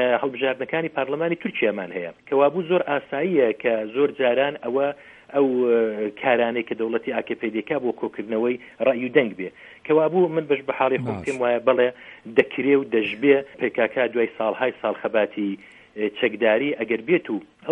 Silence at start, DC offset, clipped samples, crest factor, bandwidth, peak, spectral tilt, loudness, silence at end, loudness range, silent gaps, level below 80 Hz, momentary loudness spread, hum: 0 s; under 0.1%; under 0.1%; 22 dB; 9.4 kHz; 0 dBFS; -7 dB/octave; -23 LUFS; 0 s; 2 LU; none; -68 dBFS; 8 LU; none